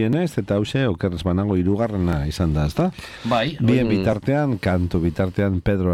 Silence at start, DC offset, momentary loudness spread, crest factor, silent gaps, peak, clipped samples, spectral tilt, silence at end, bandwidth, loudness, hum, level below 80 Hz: 0 s; under 0.1%; 4 LU; 14 dB; none; -6 dBFS; under 0.1%; -7.5 dB/octave; 0 s; 14 kHz; -21 LUFS; none; -36 dBFS